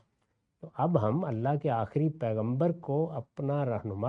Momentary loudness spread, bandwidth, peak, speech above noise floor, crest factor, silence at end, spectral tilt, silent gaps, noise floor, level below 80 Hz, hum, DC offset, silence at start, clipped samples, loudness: 5 LU; 4.9 kHz; -12 dBFS; 48 dB; 20 dB; 0 s; -11 dB/octave; none; -77 dBFS; -68 dBFS; none; under 0.1%; 0.65 s; under 0.1%; -31 LUFS